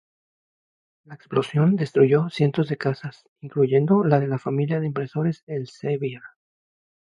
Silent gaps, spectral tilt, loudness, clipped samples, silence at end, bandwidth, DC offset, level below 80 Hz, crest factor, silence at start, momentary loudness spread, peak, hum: 3.29-3.36 s, 5.43-5.47 s; -9 dB/octave; -23 LUFS; under 0.1%; 0.85 s; 10 kHz; under 0.1%; -68 dBFS; 20 dB; 1.1 s; 13 LU; -4 dBFS; none